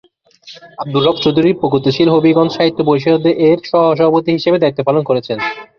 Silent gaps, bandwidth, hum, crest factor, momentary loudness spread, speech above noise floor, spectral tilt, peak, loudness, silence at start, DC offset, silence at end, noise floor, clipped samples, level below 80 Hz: none; 6.6 kHz; none; 12 dB; 6 LU; 28 dB; -7.5 dB/octave; 0 dBFS; -13 LUFS; 0.45 s; under 0.1%; 0.15 s; -41 dBFS; under 0.1%; -52 dBFS